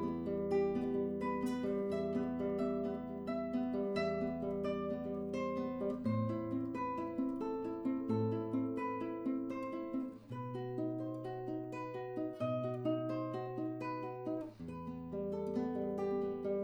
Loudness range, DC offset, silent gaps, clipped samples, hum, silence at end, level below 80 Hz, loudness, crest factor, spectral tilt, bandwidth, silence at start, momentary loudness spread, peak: 3 LU; under 0.1%; none; under 0.1%; none; 0 s; -66 dBFS; -39 LUFS; 14 dB; -8.5 dB/octave; 11 kHz; 0 s; 6 LU; -24 dBFS